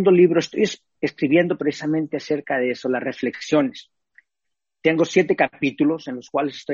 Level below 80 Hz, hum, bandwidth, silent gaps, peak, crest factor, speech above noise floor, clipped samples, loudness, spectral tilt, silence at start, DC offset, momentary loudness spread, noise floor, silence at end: -66 dBFS; none; 7.4 kHz; none; -4 dBFS; 18 dB; 64 dB; under 0.1%; -21 LUFS; -6 dB/octave; 0 s; under 0.1%; 9 LU; -84 dBFS; 0 s